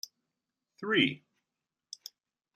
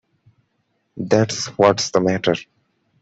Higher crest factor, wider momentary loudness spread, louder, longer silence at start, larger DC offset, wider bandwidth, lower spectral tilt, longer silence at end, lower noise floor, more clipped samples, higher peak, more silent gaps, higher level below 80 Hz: first, 26 dB vs 18 dB; first, 22 LU vs 8 LU; second, -29 LUFS vs -18 LUFS; second, 0.8 s vs 0.95 s; neither; first, 15 kHz vs 8.2 kHz; about the same, -4 dB/octave vs -4.5 dB/octave; first, 1.4 s vs 0.6 s; first, -89 dBFS vs -69 dBFS; neither; second, -12 dBFS vs -2 dBFS; neither; second, -80 dBFS vs -58 dBFS